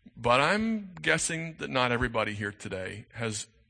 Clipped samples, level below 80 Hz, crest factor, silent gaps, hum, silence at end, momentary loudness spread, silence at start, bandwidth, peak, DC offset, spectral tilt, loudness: under 0.1%; -52 dBFS; 22 dB; none; none; 0.25 s; 12 LU; 0.05 s; 9.8 kHz; -8 dBFS; under 0.1%; -3.5 dB/octave; -29 LUFS